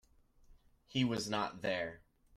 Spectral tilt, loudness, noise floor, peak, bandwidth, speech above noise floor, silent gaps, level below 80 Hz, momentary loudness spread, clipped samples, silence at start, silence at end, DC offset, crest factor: -5 dB/octave; -37 LUFS; -65 dBFS; -20 dBFS; 15 kHz; 28 dB; none; -66 dBFS; 6 LU; under 0.1%; 0.5 s; 0.4 s; under 0.1%; 20 dB